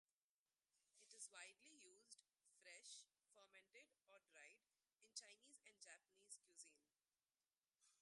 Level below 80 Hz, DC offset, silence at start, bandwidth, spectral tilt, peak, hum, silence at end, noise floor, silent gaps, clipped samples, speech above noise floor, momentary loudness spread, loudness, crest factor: under -90 dBFS; under 0.1%; 0.75 s; 11.5 kHz; 2 dB/octave; -40 dBFS; none; 0 s; under -90 dBFS; 7.58-7.62 s; under 0.1%; over 22 dB; 10 LU; -64 LUFS; 28 dB